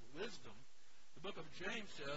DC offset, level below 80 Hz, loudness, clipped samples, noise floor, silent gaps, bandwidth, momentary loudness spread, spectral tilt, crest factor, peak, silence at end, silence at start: 0.4%; -74 dBFS; -49 LUFS; under 0.1%; -71 dBFS; none; 7.6 kHz; 20 LU; -2 dB/octave; 20 dB; -32 dBFS; 0 s; 0 s